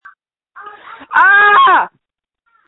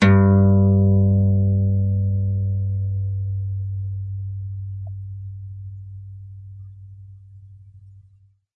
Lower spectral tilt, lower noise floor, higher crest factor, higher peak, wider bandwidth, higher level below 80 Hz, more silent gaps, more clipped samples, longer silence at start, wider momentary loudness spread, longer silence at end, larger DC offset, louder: second, -3.5 dB/octave vs -9.5 dB/octave; first, -74 dBFS vs -55 dBFS; about the same, 14 dB vs 16 dB; first, 0 dBFS vs -4 dBFS; second, 4.1 kHz vs 5 kHz; second, -60 dBFS vs -46 dBFS; neither; neither; first, 0.55 s vs 0 s; second, 10 LU vs 24 LU; about the same, 0.8 s vs 0.75 s; neither; first, -8 LUFS vs -20 LUFS